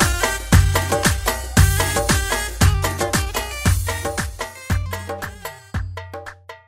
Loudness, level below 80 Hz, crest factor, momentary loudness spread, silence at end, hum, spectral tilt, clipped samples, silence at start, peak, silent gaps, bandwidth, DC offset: -20 LUFS; -26 dBFS; 18 dB; 15 LU; 0.1 s; none; -4 dB/octave; under 0.1%; 0 s; -2 dBFS; none; 16.5 kHz; under 0.1%